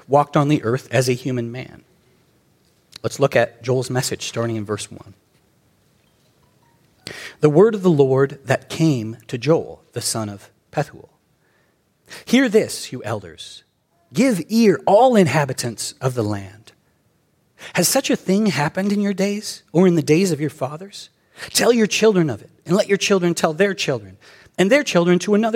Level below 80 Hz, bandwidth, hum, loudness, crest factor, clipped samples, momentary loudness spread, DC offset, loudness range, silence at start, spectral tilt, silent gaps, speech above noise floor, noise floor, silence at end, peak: -62 dBFS; 16.5 kHz; none; -19 LUFS; 18 dB; under 0.1%; 18 LU; under 0.1%; 5 LU; 0.1 s; -5 dB/octave; none; 44 dB; -62 dBFS; 0 s; -2 dBFS